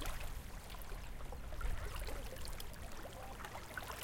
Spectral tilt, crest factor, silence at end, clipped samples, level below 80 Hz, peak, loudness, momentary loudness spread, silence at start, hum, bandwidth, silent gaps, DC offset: -4 dB/octave; 16 dB; 0 s; under 0.1%; -46 dBFS; -28 dBFS; -49 LUFS; 5 LU; 0 s; none; 17 kHz; none; under 0.1%